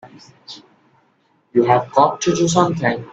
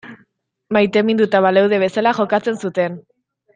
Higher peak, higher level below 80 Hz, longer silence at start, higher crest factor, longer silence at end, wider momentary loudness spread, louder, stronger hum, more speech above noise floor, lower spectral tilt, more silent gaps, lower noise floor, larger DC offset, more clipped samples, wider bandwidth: about the same, 0 dBFS vs -2 dBFS; first, -56 dBFS vs -62 dBFS; about the same, 0.05 s vs 0.05 s; about the same, 18 dB vs 16 dB; second, 0 s vs 0.55 s; first, 22 LU vs 8 LU; about the same, -17 LUFS vs -16 LUFS; neither; about the same, 43 dB vs 44 dB; second, -5 dB/octave vs -6.5 dB/octave; neither; about the same, -61 dBFS vs -60 dBFS; neither; neither; second, 8.2 kHz vs 9.4 kHz